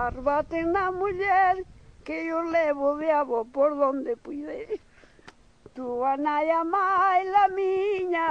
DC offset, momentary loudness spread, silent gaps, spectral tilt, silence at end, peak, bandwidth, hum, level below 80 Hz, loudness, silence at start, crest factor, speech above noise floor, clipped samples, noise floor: under 0.1%; 14 LU; none; -6 dB/octave; 0 s; -10 dBFS; 8.6 kHz; none; -54 dBFS; -25 LUFS; 0 s; 16 dB; 28 dB; under 0.1%; -53 dBFS